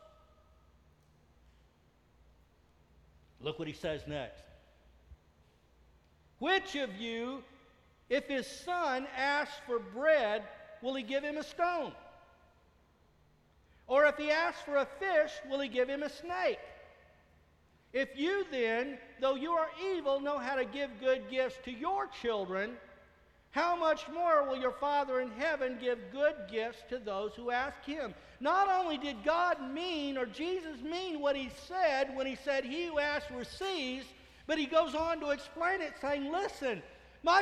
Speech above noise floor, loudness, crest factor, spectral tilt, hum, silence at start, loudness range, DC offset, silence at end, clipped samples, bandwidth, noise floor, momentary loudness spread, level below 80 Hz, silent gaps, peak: 33 dB; -34 LUFS; 22 dB; -4 dB/octave; none; 3.4 s; 7 LU; under 0.1%; 0 s; under 0.1%; 12.5 kHz; -67 dBFS; 10 LU; -64 dBFS; none; -14 dBFS